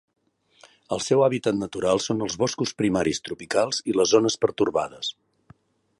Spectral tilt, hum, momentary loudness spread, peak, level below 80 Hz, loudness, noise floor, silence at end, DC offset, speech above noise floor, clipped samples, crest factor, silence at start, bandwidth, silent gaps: -4 dB/octave; none; 10 LU; -6 dBFS; -58 dBFS; -24 LUFS; -57 dBFS; 0.9 s; under 0.1%; 33 dB; under 0.1%; 20 dB; 0.9 s; 11.5 kHz; none